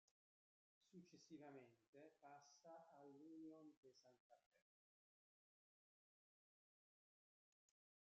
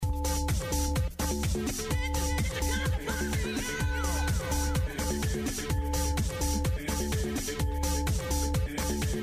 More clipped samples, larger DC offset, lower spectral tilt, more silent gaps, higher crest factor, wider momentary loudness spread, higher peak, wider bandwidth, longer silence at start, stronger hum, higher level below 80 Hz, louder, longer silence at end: neither; neither; about the same, -5 dB/octave vs -4.5 dB/octave; first, 0.11-0.81 s, 1.88-1.93 s, 3.77-3.83 s, 4.20-4.30 s, 4.46-4.51 s vs none; first, 18 dB vs 12 dB; first, 6 LU vs 2 LU; second, -52 dBFS vs -18 dBFS; second, 7.2 kHz vs 15.5 kHz; about the same, 0.1 s vs 0 s; neither; second, under -90 dBFS vs -32 dBFS; second, -65 LUFS vs -31 LUFS; first, 3.5 s vs 0 s